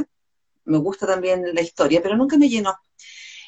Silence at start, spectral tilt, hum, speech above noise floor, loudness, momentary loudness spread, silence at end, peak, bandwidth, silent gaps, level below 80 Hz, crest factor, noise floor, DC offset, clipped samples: 0 s; -5.5 dB/octave; none; 61 dB; -20 LUFS; 19 LU; 0.05 s; -6 dBFS; 8.4 kHz; none; -60 dBFS; 16 dB; -80 dBFS; under 0.1%; under 0.1%